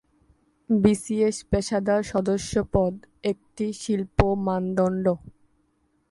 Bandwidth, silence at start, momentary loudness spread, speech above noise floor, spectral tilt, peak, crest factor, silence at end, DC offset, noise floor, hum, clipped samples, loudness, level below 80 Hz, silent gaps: 11.5 kHz; 0.7 s; 8 LU; 44 dB; -6.5 dB/octave; 0 dBFS; 24 dB; 0.8 s; under 0.1%; -68 dBFS; none; under 0.1%; -25 LUFS; -40 dBFS; none